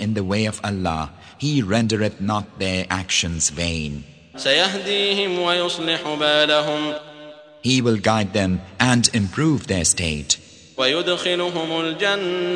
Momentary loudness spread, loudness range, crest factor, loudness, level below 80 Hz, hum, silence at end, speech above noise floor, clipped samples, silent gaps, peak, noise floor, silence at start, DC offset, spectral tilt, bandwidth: 8 LU; 3 LU; 22 dB; -20 LUFS; -46 dBFS; none; 0 s; 21 dB; under 0.1%; none; 0 dBFS; -41 dBFS; 0 s; under 0.1%; -3.5 dB/octave; 10.5 kHz